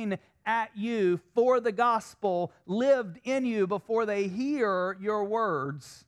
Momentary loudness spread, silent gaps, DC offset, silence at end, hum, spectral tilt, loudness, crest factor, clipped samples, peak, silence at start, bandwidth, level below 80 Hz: 7 LU; none; under 0.1%; 0.15 s; none; -6 dB/octave; -28 LUFS; 16 dB; under 0.1%; -14 dBFS; 0 s; 12.5 kHz; -72 dBFS